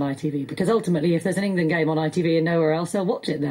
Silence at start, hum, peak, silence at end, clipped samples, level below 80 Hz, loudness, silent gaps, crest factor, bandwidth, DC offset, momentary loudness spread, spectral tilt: 0 s; none; -10 dBFS; 0 s; under 0.1%; -62 dBFS; -22 LUFS; none; 12 dB; 13.5 kHz; under 0.1%; 5 LU; -6.5 dB/octave